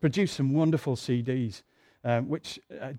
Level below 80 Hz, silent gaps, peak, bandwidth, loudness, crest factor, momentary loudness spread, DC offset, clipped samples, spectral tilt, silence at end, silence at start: -64 dBFS; none; -12 dBFS; 14 kHz; -29 LUFS; 16 dB; 13 LU; under 0.1%; under 0.1%; -7 dB/octave; 0 s; 0 s